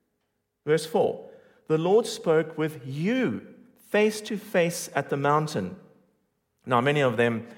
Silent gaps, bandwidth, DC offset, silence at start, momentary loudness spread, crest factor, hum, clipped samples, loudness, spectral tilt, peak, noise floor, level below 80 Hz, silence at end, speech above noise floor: none; 17 kHz; under 0.1%; 0.65 s; 10 LU; 18 dB; none; under 0.1%; -26 LUFS; -5.5 dB/octave; -8 dBFS; -77 dBFS; -74 dBFS; 0.05 s; 52 dB